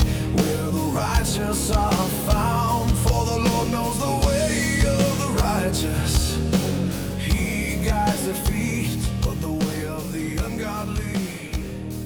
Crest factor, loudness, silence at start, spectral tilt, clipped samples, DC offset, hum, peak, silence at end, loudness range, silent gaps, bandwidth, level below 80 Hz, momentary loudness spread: 16 dB; -23 LUFS; 0 s; -5 dB/octave; under 0.1%; under 0.1%; none; -6 dBFS; 0 s; 4 LU; none; over 20 kHz; -28 dBFS; 7 LU